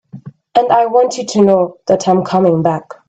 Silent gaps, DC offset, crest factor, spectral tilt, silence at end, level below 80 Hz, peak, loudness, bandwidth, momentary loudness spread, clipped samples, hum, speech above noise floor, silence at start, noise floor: none; under 0.1%; 14 dB; -6 dB/octave; 0.15 s; -56 dBFS; 0 dBFS; -13 LUFS; 8.8 kHz; 4 LU; under 0.1%; none; 22 dB; 0.15 s; -34 dBFS